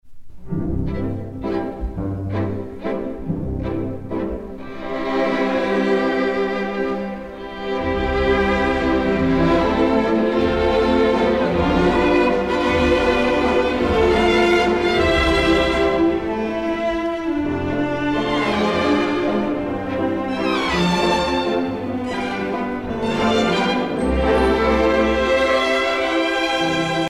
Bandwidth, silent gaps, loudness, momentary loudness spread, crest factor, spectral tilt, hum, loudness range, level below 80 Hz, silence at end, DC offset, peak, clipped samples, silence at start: 13 kHz; none; -19 LUFS; 10 LU; 14 dB; -6 dB/octave; none; 8 LU; -34 dBFS; 0 s; under 0.1%; -4 dBFS; under 0.1%; 0.05 s